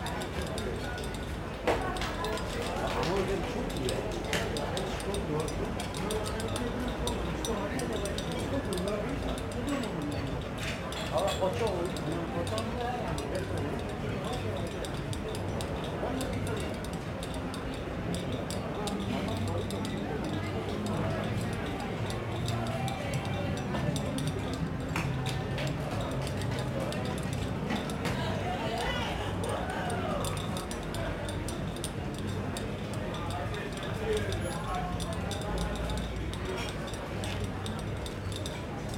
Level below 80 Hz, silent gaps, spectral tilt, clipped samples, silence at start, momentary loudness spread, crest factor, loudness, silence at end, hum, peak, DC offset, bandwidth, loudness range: -44 dBFS; none; -5.5 dB/octave; under 0.1%; 0 s; 4 LU; 18 dB; -34 LUFS; 0 s; none; -14 dBFS; under 0.1%; 17 kHz; 2 LU